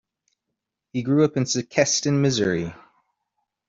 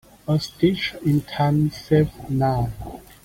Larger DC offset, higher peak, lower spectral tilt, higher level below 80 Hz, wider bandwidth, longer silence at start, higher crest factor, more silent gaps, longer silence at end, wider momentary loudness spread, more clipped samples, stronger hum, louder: neither; about the same, -4 dBFS vs -6 dBFS; second, -4.5 dB/octave vs -7.5 dB/octave; second, -60 dBFS vs -44 dBFS; second, 7.8 kHz vs 16 kHz; first, 0.95 s vs 0.25 s; about the same, 20 dB vs 16 dB; neither; first, 0.95 s vs 0.25 s; first, 10 LU vs 6 LU; neither; neither; about the same, -22 LUFS vs -22 LUFS